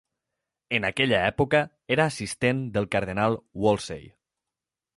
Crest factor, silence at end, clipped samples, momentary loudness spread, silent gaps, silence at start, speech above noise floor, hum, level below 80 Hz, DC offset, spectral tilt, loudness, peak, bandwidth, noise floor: 20 dB; 0.85 s; under 0.1%; 6 LU; none; 0.7 s; 64 dB; none; -52 dBFS; under 0.1%; -5 dB/octave; -25 LUFS; -8 dBFS; 11.5 kHz; -89 dBFS